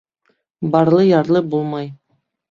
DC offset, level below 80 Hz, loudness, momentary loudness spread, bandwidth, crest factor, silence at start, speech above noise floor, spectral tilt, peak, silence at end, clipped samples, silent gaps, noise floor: under 0.1%; -58 dBFS; -16 LUFS; 14 LU; 7.2 kHz; 16 dB; 0.6 s; 52 dB; -9 dB/octave; -2 dBFS; 0.55 s; under 0.1%; none; -67 dBFS